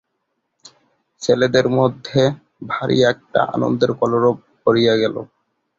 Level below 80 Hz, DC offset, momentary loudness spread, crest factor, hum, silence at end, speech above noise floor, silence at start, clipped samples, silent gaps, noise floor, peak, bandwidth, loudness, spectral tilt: -56 dBFS; under 0.1%; 9 LU; 18 dB; none; 0.55 s; 56 dB; 1.2 s; under 0.1%; none; -73 dBFS; -2 dBFS; 7.8 kHz; -18 LUFS; -6 dB/octave